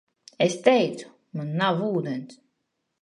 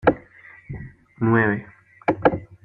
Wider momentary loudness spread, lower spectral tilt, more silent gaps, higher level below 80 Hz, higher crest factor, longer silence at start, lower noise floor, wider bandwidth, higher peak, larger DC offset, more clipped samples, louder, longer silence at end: second, 15 LU vs 19 LU; second, -5.5 dB/octave vs -10 dB/octave; neither; second, -76 dBFS vs -48 dBFS; about the same, 22 dB vs 22 dB; first, 0.4 s vs 0.05 s; first, -78 dBFS vs -48 dBFS; first, 11 kHz vs 5.4 kHz; about the same, -4 dBFS vs -2 dBFS; neither; neither; about the same, -24 LUFS vs -22 LUFS; first, 0.65 s vs 0.1 s